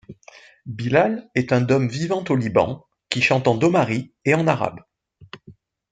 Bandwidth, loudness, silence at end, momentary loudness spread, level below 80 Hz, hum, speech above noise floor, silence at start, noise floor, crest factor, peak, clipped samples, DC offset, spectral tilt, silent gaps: 9.2 kHz; -20 LUFS; 0.4 s; 10 LU; -58 dBFS; none; 28 dB; 0.1 s; -48 dBFS; 20 dB; -2 dBFS; under 0.1%; under 0.1%; -6.5 dB/octave; none